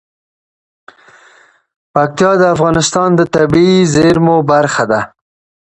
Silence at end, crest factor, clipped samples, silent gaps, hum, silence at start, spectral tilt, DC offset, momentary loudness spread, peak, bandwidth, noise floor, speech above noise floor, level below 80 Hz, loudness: 0.6 s; 12 dB; under 0.1%; none; none; 1.95 s; -5.5 dB/octave; under 0.1%; 6 LU; 0 dBFS; 9.6 kHz; -46 dBFS; 37 dB; -42 dBFS; -11 LUFS